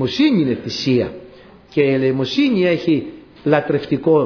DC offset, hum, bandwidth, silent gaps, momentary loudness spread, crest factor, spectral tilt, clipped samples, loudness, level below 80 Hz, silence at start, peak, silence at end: under 0.1%; none; 5.4 kHz; none; 10 LU; 14 dB; -7 dB/octave; under 0.1%; -18 LUFS; -52 dBFS; 0 s; -2 dBFS; 0 s